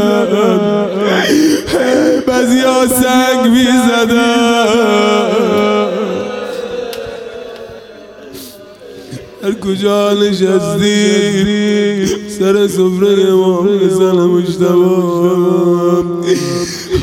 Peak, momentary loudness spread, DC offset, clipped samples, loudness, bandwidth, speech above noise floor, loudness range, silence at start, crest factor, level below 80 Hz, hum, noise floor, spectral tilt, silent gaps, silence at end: 0 dBFS; 13 LU; under 0.1%; under 0.1%; -11 LUFS; 17 kHz; 23 dB; 9 LU; 0 s; 12 dB; -44 dBFS; none; -33 dBFS; -5 dB/octave; none; 0 s